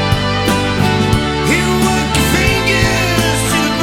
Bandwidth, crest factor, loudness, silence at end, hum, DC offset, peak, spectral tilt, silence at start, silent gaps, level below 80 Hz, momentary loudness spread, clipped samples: 17.5 kHz; 14 dB; -13 LUFS; 0 s; none; under 0.1%; 0 dBFS; -4.5 dB/octave; 0 s; none; -26 dBFS; 2 LU; under 0.1%